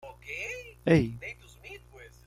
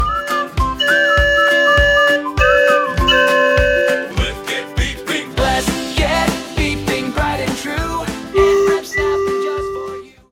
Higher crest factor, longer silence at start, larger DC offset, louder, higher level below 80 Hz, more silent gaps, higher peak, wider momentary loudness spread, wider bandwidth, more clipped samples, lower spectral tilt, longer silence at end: first, 22 dB vs 16 dB; about the same, 0.05 s vs 0 s; neither; second, -29 LUFS vs -15 LUFS; second, -52 dBFS vs -26 dBFS; neither; second, -10 dBFS vs 0 dBFS; first, 22 LU vs 10 LU; second, 14 kHz vs 17.5 kHz; neither; first, -7 dB/octave vs -4 dB/octave; about the same, 0.2 s vs 0.25 s